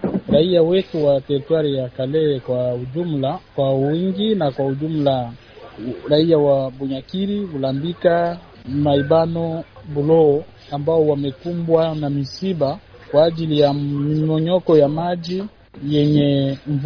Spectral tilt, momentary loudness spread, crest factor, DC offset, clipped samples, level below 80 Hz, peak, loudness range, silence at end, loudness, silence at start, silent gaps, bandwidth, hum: -9 dB/octave; 11 LU; 16 dB; under 0.1%; under 0.1%; -50 dBFS; -2 dBFS; 2 LU; 0 s; -19 LUFS; 0 s; none; 5.4 kHz; none